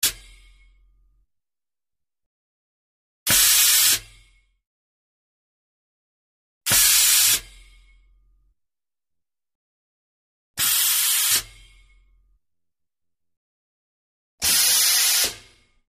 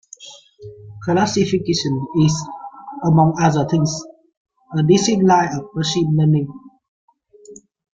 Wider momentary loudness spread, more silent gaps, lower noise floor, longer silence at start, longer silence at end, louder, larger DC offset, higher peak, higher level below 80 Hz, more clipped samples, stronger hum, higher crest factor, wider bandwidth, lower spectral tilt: second, 10 LU vs 20 LU; first, 2.26-3.26 s, 4.67-6.61 s, 9.55-10.54 s, 13.37-14.38 s vs 4.37-4.45 s, 6.88-7.08 s; first, under -90 dBFS vs -44 dBFS; second, 0 s vs 0.2 s; about the same, 0.5 s vs 0.4 s; about the same, -16 LUFS vs -17 LUFS; neither; about the same, -4 dBFS vs -2 dBFS; about the same, -54 dBFS vs -52 dBFS; neither; neither; first, 22 dB vs 16 dB; first, 15.5 kHz vs 7.8 kHz; second, 2 dB/octave vs -6 dB/octave